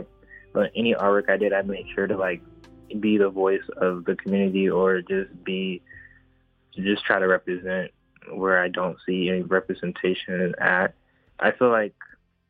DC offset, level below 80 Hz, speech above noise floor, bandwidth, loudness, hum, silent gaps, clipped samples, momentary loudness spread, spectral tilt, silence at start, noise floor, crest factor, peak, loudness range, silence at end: under 0.1%; -60 dBFS; 39 dB; 4.8 kHz; -24 LUFS; none; none; under 0.1%; 9 LU; -8.5 dB/octave; 0 s; -62 dBFS; 20 dB; -4 dBFS; 2 LU; 0.45 s